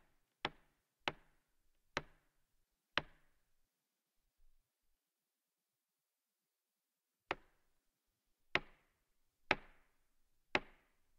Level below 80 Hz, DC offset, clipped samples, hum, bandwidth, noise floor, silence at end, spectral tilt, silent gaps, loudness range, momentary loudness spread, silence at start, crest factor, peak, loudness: -70 dBFS; under 0.1%; under 0.1%; none; 15.5 kHz; under -90 dBFS; 0.5 s; -3.5 dB/octave; none; 12 LU; 7 LU; 0.45 s; 36 dB; -14 dBFS; -43 LUFS